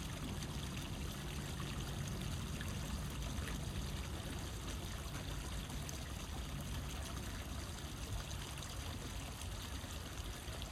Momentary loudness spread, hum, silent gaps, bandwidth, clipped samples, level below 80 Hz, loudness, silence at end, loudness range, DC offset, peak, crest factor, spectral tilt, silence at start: 3 LU; none; none; 16 kHz; under 0.1%; -48 dBFS; -45 LUFS; 0 s; 2 LU; under 0.1%; -28 dBFS; 16 dB; -4 dB/octave; 0 s